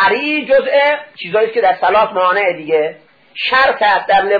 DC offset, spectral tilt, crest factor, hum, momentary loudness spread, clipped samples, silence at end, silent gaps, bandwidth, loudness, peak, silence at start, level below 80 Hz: under 0.1%; -5.5 dB/octave; 12 dB; none; 8 LU; under 0.1%; 0 s; none; 5 kHz; -13 LUFS; -2 dBFS; 0 s; -52 dBFS